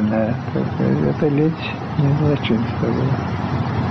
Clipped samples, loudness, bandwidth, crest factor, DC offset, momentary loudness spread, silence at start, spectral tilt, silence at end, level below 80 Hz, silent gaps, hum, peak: under 0.1%; -20 LUFS; 6.2 kHz; 12 dB; under 0.1%; 5 LU; 0 s; -9 dB/octave; 0 s; -42 dBFS; none; none; -8 dBFS